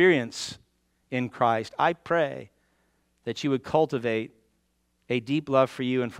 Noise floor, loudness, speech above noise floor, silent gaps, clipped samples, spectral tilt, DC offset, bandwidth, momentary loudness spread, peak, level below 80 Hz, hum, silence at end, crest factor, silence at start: -72 dBFS; -27 LUFS; 46 dB; none; under 0.1%; -5.5 dB/octave; under 0.1%; 12.5 kHz; 12 LU; -8 dBFS; -66 dBFS; none; 0 s; 20 dB; 0 s